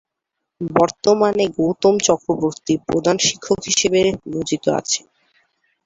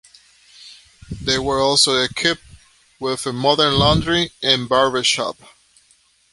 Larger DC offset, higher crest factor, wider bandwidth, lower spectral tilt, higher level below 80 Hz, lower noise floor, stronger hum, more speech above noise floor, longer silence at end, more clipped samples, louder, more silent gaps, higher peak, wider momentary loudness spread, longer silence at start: neither; about the same, 18 dB vs 18 dB; second, 8 kHz vs 11.5 kHz; about the same, -3.5 dB/octave vs -3 dB/octave; second, -52 dBFS vs -40 dBFS; first, -80 dBFS vs -57 dBFS; neither; first, 62 dB vs 39 dB; second, 0.85 s vs 1 s; neither; about the same, -18 LUFS vs -17 LUFS; neither; about the same, -2 dBFS vs -2 dBFS; second, 7 LU vs 13 LU; about the same, 0.6 s vs 0.65 s